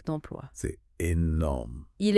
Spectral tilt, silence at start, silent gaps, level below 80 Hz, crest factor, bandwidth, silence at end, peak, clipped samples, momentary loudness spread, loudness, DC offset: -6.5 dB/octave; 0.05 s; none; -40 dBFS; 20 dB; 12 kHz; 0 s; -8 dBFS; under 0.1%; 12 LU; -31 LUFS; under 0.1%